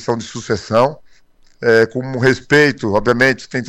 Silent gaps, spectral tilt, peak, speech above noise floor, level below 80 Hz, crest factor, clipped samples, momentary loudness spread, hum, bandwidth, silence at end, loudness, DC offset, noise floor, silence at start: none; -5.5 dB/octave; -2 dBFS; 33 dB; -44 dBFS; 14 dB; under 0.1%; 10 LU; none; 13 kHz; 0 s; -15 LUFS; under 0.1%; -48 dBFS; 0 s